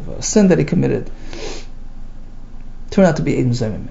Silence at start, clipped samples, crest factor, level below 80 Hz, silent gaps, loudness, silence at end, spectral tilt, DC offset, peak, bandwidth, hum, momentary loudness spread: 0 s; under 0.1%; 18 dB; -28 dBFS; none; -16 LUFS; 0 s; -6 dB/octave; under 0.1%; 0 dBFS; 8 kHz; none; 18 LU